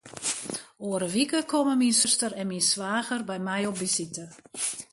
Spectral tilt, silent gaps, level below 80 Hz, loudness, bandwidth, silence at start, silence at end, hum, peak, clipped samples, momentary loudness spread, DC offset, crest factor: -2.5 dB/octave; none; -72 dBFS; -26 LUFS; 12 kHz; 0.05 s; 0.1 s; none; -10 dBFS; under 0.1%; 12 LU; under 0.1%; 18 dB